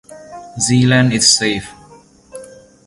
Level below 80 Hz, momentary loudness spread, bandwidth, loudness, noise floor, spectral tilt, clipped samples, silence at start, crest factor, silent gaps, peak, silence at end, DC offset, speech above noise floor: -48 dBFS; 25 LU; 11.5 kHz; -13 LUFS; -44 dBFS; -3.5 dB/octave; under 0.1%; 0.1 s; 16 dB; none; 0 dBFS; 0.4 s; under 0.1%; 31 dB